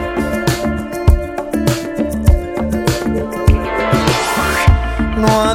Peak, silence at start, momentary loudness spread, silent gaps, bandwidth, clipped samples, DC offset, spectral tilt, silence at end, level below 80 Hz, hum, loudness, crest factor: 0 dBFS; 0 s; 6 LU; none; 17.5 kHz; under 0.1%; under 0.1%; -5.5 dB/octave; 0 s; -20 dBFS; none; -16 LUFS; 14 dB